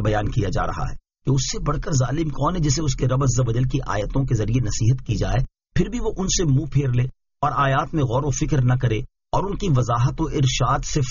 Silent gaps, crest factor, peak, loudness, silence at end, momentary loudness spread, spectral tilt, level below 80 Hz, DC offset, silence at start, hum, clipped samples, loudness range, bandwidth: none; 14 dB; -8 dBFS; -22 LUFS; 0 s; 6 LU; -6.5 dB/octave; -32 dBFS; under 0.1%; 0 s; none; under 0.1%; 1 LU; 7.4 kHz